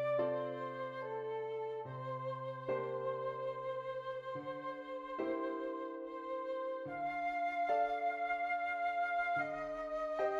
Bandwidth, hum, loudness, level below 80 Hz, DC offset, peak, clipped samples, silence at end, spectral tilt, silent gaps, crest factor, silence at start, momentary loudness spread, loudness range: 7.4 kHz; none; -39 LUFS; -72 dBFS; under 0.1%; -24 dBFS; under 0.1%; 0 s; -7 dB/octave; none; 14 dB; 0 s; 8 LU; 5 LU